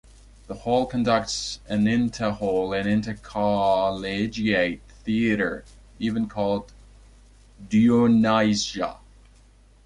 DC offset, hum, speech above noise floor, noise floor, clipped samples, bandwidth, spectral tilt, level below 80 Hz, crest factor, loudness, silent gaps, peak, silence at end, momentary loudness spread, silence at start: under 0.1%; none; 31 dB; -53 dBFS; under 0.1%; 11 kHz; -5.5 dB/octave; -48 dBFS; 16 dB; -23 LUFS; none; -8 dBFS; 0.9 s; 12 LU; 0.5 s